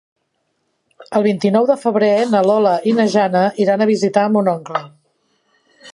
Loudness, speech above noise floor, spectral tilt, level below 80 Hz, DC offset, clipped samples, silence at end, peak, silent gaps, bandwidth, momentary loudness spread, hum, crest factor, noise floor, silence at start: -15 LUFS; 54 dB; -6.5 dB/octave; -68 dBFS; under 0.1%; under 0.1%; 0.05 s; 0 dBFS; none; 11 kHz; 5 LU; none; 16 dB; -69 dBFS; 1 s